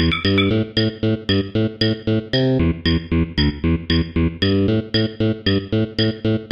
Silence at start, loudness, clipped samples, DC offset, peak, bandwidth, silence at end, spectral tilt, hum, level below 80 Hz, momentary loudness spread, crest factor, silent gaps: 0 s; -19 LUFS; under 0.1%; 0.1%; -4 dBFS; 6.6 kHz; 0 s; -8 dB/octave; none; -34 dBFS; 4 LU; 16 dB; none